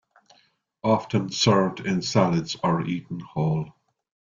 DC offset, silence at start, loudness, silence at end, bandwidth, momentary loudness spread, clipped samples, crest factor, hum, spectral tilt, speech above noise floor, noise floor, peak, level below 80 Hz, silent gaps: under 0.1%; 0.85 s; -24 LUFS; 0.7 s; 7.6 kHz; 10 LU; under 0.1%; 20 dB; none; -5.5 dB/octave; 41 dB; -64 dBFS; -6 dBFS; -58 dBFS; none